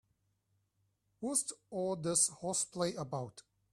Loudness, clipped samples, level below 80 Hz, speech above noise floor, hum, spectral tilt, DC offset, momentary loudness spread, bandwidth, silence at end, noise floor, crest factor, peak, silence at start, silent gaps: -35 LUFS; under 0.1%; -74 dBFS; 43 dB; none; -3.5 dB/octave; under 0.1%; 12 LU; 15 kHz; 0.35 s; -79 dBFS; 24 dB; -14 dBFS; 1.2 s; none